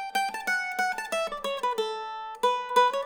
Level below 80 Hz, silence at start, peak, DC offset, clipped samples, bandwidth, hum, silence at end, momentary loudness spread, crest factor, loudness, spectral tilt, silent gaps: -64 dBFS; 0 s; -10 dBFS; under 0.1%; under 0.1%; over 20 kHz; none; 0 s; 8 LU; 18 dB; -28 LUFS; -0.5 dB/octave; none